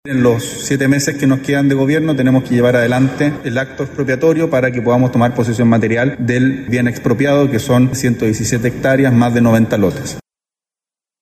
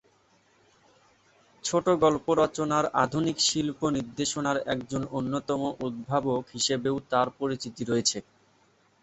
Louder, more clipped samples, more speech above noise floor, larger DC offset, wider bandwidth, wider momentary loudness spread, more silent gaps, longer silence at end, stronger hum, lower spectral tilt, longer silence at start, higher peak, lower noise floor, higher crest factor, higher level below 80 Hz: first, -14 LUFS vs -27 LUFS; neither; first, over 77 dB vs 37 dB; neither; first, 15 kHz vs 8.4 kHz; about the same, 6 LU vs 8 LU; neither; first, 1 s vs 0.8 s; neither; first, -6.5 dB/octave vs -4 dB/octave; second, 0.05 s vs 1.65 s; first, 0 dBFS vs -8 dBFS; first, under -90 dBFS vs -64 dBFS; second, 14 dB vs 20 dB; first, -44 dBFS vs -60 dBFS